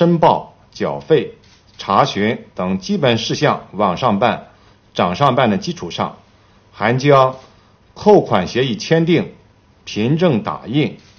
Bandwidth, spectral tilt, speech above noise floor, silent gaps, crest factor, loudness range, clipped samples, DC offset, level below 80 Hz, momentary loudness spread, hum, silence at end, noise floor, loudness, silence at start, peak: 6.8 kHz; -6 dB/octave; 34 dB; none; 16 dB; 3 LU; under 0.1%; under 0.1%; -52 dBFS; 12 LU; none; 0.2 s; -50 dBFS; -16 LUFS; 0 s; 0 dBFS